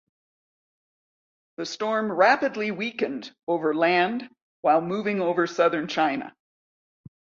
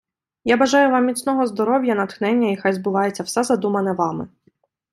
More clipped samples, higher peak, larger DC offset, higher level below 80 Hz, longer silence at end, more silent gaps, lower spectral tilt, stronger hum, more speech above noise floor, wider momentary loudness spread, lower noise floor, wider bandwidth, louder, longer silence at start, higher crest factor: neither; about the same, -6 dBFS vs -4 dBFS; neither; second, -72 dBFS vs -64 dBFS; first, 1.1 s vs 0.65 s; first, 3.43-3.47 s, 4.42-4.63 s vs none; about the same, -5 dB/octave vs -5 dB/octave; neither; first, over 66 dB vs 43 dB; first, 13 LU vs 8 LU; first, under -90 dBFS vs -62 dBFS; second, 7.6 kHz vs 14 kHz; second, -24 LUFS vs -19 LUFS; first, 1.6 s vs 0.45 s; about the same, 20 dB vs 16 dB